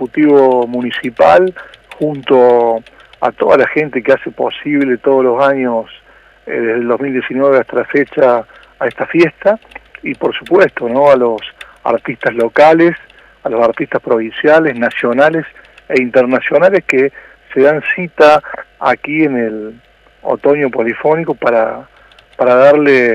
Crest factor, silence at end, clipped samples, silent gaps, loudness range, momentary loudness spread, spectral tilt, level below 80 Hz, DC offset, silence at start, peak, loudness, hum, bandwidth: 12 dB; 0 s; under 0.1%; none; 3 LU; 12 LU; -7 dB/octave; -52 dBFS; under 0.1%; 0 s; 0 dBFS; -12 LUFS; none; 9.8 kHz